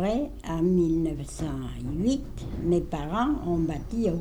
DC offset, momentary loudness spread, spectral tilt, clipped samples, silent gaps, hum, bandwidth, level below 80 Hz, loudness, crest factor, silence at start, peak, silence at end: under 0.1%; 9 LU; -7.5 dB/octave; under 0.1%; none; none; 14 kHz; -38 dBFS; -28 LUFS; 14 dB; 0 s; -14 dBFS; 0 s